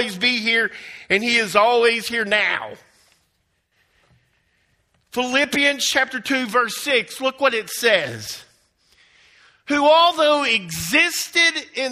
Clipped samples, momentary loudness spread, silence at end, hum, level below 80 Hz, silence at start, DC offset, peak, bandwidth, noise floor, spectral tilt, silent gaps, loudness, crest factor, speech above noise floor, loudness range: under 0.1%; 10 LU; 0 s; none; -62 dBFS; 0 s; under 0.1%; -2 dBFS; 16 kHz; -68 dBFS; -2 dB/octave; none; -18 LUFS; 20 dB; 49 dB; 6 LU